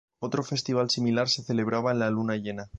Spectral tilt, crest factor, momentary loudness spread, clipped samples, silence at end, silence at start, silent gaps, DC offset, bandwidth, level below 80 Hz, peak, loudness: -5 dB/octave; 14 dB; 6 LU; under 0.1%; 0 s; 0.2 s; none; under 0.1%; 9.2 kHz; -58 dBFS; -12 dBFS; -27 LUFS